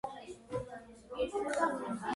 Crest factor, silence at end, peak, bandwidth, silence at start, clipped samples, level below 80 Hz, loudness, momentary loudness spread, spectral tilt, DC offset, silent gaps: 20 dB; 0 s; -18 dBFS; 11.5 kHz; 0.05 s; under 0.1%; -62 dBFS; -37 LUFS; 15 LU; -5 dB/octave; under 0.1%; none